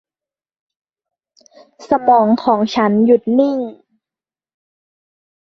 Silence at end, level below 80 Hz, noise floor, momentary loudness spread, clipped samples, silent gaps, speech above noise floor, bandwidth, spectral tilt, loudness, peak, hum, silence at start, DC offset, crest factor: 1.85 s; -60 dBFS; under -90 dBFS; 7 LU; under 0.1%; none; over 76 dB; 6.8 kHz; -7 dB/octave; -14 LUFS; -2 dBFS; none; 1.8 s; under 0.1%; 16 dB